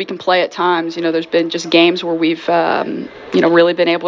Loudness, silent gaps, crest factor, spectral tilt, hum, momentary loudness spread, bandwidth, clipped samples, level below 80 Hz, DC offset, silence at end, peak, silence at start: -15 LUFS; none; 14 dB; -5 dB/octave; none; 7 LU; 7.6 kHz; under 0.1%; -62 dBFS; under 0.1%; 0 s; 0 dBFS; 0 s